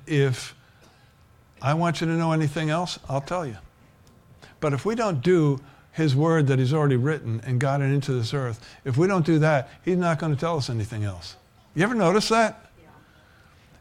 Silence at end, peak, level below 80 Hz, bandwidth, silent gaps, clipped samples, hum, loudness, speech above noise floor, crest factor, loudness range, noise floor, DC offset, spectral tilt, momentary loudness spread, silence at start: 1.25 s; -8 dBFS; -56 dBFS; 13 kHz; none; under 0.1%; none; -24 LUFS; 33 dB; 16 dB; 4 LU; -56 dBFS; under 0.1%; -6.5 dB/octave; 11 LU; 0 s